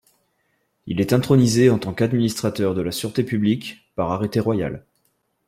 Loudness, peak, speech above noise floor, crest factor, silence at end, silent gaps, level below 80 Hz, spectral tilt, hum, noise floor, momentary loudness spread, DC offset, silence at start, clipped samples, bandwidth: -21 LUFS; -4 dBFS; 49 dB; 18 dB; 0.7 s; none; -52 dBFS; -6.5 dB/octave; none; -69 dBFS; 11 LU; under 0.1%; 0.85 s; under 0.1%; 16 kHz